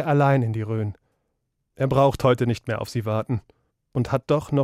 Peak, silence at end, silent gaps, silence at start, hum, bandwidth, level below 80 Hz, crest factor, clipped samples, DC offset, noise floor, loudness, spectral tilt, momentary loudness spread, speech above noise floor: -6 dBFS; 0 s; none; 0 s; none; 14.5 kHz; -50 dBFS; 16 dB; under 0.1%; under 0.1%; -75 dBFS; -23 LUFS; -7.5 dB/octave; 10 LU; 54 dB